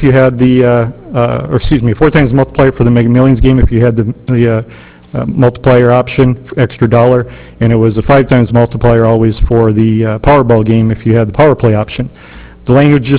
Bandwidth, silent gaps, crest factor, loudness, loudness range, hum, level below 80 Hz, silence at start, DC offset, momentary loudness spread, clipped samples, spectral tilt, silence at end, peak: 4 kHz; none; 8 dB; -9 LUFS; 2 LU; none; -24 dBFS; 0 s; under 0.1%; 7 LU; 0.5%; -12 dB/octave; 0 s; 0 dBFS